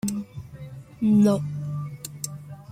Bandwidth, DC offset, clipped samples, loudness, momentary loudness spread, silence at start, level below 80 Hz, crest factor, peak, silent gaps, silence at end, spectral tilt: 16 kHz; under 0.1%; under 0.1%; -25 LUFS; 21 LU; 0.05 s; -56 dBFS; 16 dB; -10 dBFS; none; 0 s; -7 dB/octave